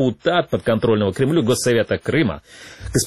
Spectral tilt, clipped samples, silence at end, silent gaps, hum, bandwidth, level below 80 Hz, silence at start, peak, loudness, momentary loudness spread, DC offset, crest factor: -5 dB/octave; under 0.1%; 0 s; none; none; 13.5 kHz; -44 dBFS; 0 s; -6 dBFS; -19 LUFS; 6 LU; 0.2%; 14 dB